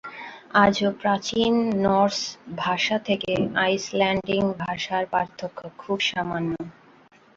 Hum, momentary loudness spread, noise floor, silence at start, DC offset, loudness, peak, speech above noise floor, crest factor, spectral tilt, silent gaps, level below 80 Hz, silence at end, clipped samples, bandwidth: none; 12 LU; -54 dBFS; 0.05 s; under 0.1%; -23 LUFS; -4 dBFS; 31 dB; 20 dB; -4.5 dB/octave; none; -56 dBFS; 0.65 s; under 0.1%; 7.8 kHz